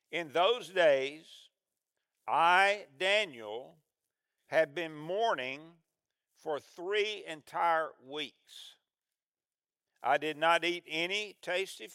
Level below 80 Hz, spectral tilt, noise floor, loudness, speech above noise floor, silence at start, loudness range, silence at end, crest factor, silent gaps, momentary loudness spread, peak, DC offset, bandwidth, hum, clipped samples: under -90 dBFS; -3 dB/octave; under -90 dBFS; -31 LUFS; over 58 dB; 0.1 s; 6 LU; 0 s; 22 dB; 9.28-9.32 s; 16 LU; -12 dBFS; under 0.1%; 15.5 kHz; none; under 0.1%